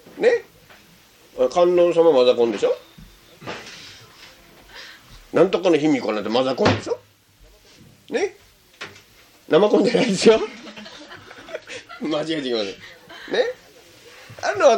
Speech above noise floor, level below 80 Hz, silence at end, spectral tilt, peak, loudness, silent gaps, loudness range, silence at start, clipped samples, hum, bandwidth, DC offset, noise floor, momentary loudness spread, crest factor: 34 dB; -58 dBFS; 0 s; -5 dB/octave; -2 dBFS; -20 LUFS; none; 7 LU; 0.15 s; under 0.1%; none; 16 kHz; under 0.1%; -52 dBFS; 24 LU; 20 dB